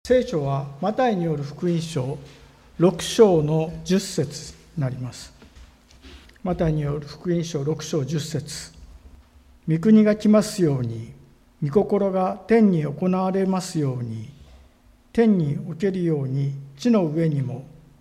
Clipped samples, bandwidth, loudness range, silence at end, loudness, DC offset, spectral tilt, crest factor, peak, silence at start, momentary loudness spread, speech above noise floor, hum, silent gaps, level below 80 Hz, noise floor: under 0.1%; 14.5 kHz; 7 LU; 0.3 s; -22 LUFS; under 0.1%; -7 dB/octave; 20 dB; -4 dBFS; 0.05 s; 17 LU; 33 dB; none; none; -48 dBFS; -54 dBFS